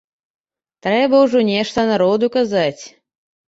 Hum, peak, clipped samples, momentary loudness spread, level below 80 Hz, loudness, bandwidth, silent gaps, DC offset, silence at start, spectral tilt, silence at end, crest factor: none; -4 dBFS; under 0.1%; 9 LU; -56 dBFS; -16 LUFS; 8 kHz; none; under 0.1%; 0.85 s; -5.5 dB/octave; 0.7 s; 14 dB